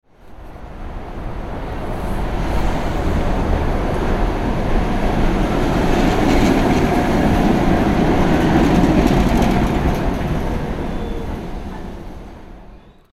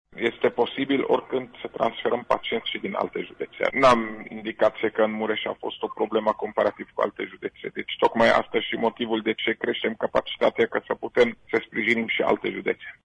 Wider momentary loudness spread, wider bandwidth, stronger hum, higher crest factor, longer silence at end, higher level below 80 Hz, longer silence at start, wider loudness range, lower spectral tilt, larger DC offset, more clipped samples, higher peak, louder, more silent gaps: first, 16 LU vs 11 LU; first, 14.5 kHz vs 10.5 kHz; neither; about the same, 16 dB vs 18 dB; first, 0.4 s vs 0.15 s; first, -22 dBFS vs -58 dBFS; about the same, 0.25 s vs 0.15 s; first, 8 LU vs 2 LU; first, -7 dB/octave vs -5 dB/octave; neither; neither; first, 0 dBFS vs -6 dBFS; first, -18 LUFS vs -25 LUFS; neither